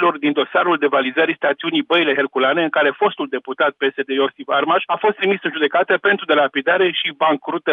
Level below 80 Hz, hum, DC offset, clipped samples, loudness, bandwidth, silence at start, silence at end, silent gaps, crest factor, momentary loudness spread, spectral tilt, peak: -80 dBFS; none; under 0.1%; under 0.1%; -17 LUFS; 4.6 kHz; 0 s; 0 s; none; 14 dB; 4 LU; -7 dB/octave; -4 dBFS